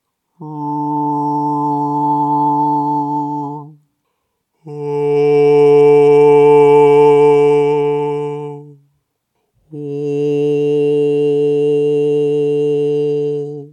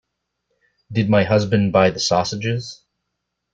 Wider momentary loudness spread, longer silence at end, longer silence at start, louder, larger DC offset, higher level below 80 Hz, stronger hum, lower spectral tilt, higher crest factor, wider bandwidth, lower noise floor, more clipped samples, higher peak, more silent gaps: first, 15 LU vs 10 LU; second, 0.05 s vs 0.8 s; second, 0.4 s vs 0.9 s; first, -13 LUFS vs -18 LUFS; neither; second, -74 dBFS vs -52 dBFS; second, none vs 60 Hz at -40 dBFS; first, -8 dB/octave vs -5.5 dB/octave; about the same, 14 dB vs 18 dB; first, 8.8 kHz vs 7.8 kHz; second, -70 dBFS vs -77 dBFS; neither; about the same, 0 dBFS vs -2 dBFS; neither